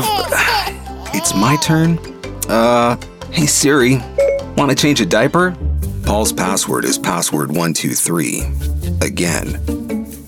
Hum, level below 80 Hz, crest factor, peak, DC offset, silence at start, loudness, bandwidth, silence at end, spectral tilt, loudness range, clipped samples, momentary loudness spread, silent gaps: none; -28 dBFS; 14 dB; -2 dBFS; under 0.1%; 0 s; -15 LUFS; 17.5 kHz; 0 s; -4 dB/octave; 3 LU; under 0.1%; 9 LU; none